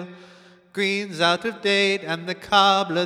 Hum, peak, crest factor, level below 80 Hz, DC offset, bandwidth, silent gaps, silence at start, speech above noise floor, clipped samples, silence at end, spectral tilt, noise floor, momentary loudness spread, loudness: none; -4 dBFS; 20 dB; -66 dBFS; under 0.1%; 14 kHz; none; 0 s; 29 dB; under 0.1%; 0 s; -3.5 dB/octave; -50 dBFS; 11 LU; -21 LUFS